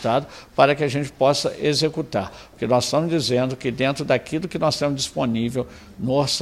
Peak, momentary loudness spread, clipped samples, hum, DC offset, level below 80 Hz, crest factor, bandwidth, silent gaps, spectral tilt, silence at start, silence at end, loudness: -2 dBFS; 9 LU; under 0.1%; none; under 0.1%; -52 dBFS; 20 dB; 15 kHz; none; -5 dB/octave; 0 s; 0 s; -22 LUFS